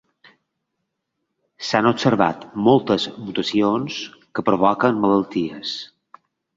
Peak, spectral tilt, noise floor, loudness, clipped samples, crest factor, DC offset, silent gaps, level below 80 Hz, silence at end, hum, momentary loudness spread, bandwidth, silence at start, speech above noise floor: -2 dBFS; -6 dB/octave; -77 dBFS; -20 LUFS; under 0.1%; 20 dB; under 0.1%; none; -58 dBFS; 0.7 s; none; 12 LU; 7.8 kHz; 1.6 s; 58 dB